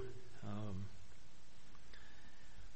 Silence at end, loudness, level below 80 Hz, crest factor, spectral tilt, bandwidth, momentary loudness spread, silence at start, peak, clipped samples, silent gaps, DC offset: 0 s; -53 LUFS; -66 dBFS; 18 dB; -6 dB/octave; 8.4 kHz; 17 LU; 0 s; -30 dBFS; under 0.1%; none; 0.9%